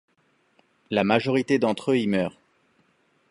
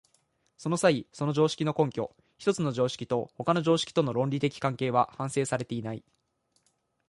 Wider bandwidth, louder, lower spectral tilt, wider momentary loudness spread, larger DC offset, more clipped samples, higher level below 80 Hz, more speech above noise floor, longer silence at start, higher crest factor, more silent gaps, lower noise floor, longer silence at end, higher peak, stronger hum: about the same, 11.5 kHz vs 11.5 kHz; first, -24 LUFS vs -29 LUFS; about the same, -6.5 dB/octave vs -5.5 dB/octave; second, 6 LU vs 10 LU; neither; neither; about the same, -64 dBFS vs -66 dBFS; about the same, 44 dB vs 46 dB; first, 0.9 s vs 0.6 s; about the same, 20 dB vs 20 dB; neither; second, -66 dBFS vs -74 dBFS; about the same, 1 s vs 1.1 s; first, -6 dBFS vs -10 dBFS; neither